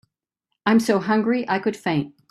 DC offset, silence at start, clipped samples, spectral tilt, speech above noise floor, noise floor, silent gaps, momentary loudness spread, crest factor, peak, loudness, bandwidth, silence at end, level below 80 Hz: under 0.1%; 0.65 s; under 0.1%; -6 dB/octave; 59 dB; -80 dBFS; none; 7 LU; 18 dB; -6 dBFS; -21 LUFS; 13.5 kHz; 0.2 s; -66 dBFS